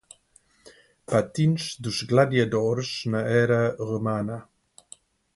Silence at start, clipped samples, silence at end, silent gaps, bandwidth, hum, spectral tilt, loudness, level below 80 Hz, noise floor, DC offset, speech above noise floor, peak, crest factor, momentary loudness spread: 0.65 s; under 0.1%; 0.95 s; none; 11.5 kHz; none; -6 dB/octave; -24 LUFS; -60 dBFS; -61 dBFS; under 0.1%; 38 dB; -6 dBFS; 18 dB; 9 LU